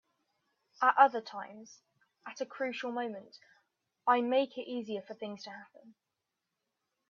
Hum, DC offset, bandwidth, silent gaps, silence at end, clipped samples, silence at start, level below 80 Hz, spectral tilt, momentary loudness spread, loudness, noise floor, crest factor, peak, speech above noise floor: none; under 0.1%; 7.2 kHz; none; 1.2 s; under 0.1%; 0.8 s; -90 dBFS; -4 dB/octave; 22 LU; -32 LUFS; -87 dBFS; 26 dB; -8 dBFS; 54 dB